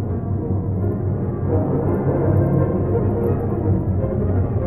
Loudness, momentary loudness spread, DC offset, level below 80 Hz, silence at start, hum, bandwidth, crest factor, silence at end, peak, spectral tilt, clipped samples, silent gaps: -20 LUFS; 5 LU; under 0.1%; -34 dBFS; 0 s; none; 2.6 kHz; 14 dB; 0 s; -6 dBFS; -13 dB/octave; under 0.1%; none